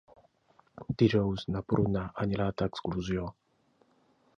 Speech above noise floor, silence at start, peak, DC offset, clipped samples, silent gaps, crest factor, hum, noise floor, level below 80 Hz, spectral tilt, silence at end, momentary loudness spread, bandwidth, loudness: 39 dB; 0.75 s; -10 dBFS; under 0.1%; under 0.1%; none; 22 dB; none; -69 dBFS; -52 dBFS; -8 dB/octave; 1.05 s; 10 LU; 7.2 kHz; -31 LUFS